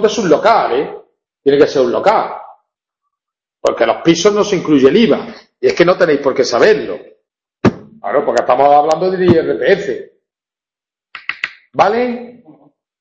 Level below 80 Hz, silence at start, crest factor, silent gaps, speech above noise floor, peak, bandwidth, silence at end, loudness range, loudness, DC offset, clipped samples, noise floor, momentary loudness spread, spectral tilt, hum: -50 dBFS; 0 s; 14 dB; none; 78 dB; 0 dBFS; 8 kHz; 0.7 s; 4 LU; -13 LUFS; under 0.1%; under 0.1%; -90 dBFS; 14 LU; -5 dB/octave; none